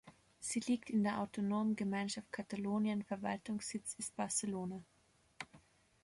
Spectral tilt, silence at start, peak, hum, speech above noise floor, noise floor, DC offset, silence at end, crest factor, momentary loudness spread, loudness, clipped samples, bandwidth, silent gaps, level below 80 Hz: -4.5 dB/octave; 0.05 s; -24 dBFS; none; 28 dB; -67 dBFS; under 0.1%; 0.45 s; 16 dB; 10 LU; -39 LUFS; under 0.1%; 11.5 kHz; none; -74 dBFS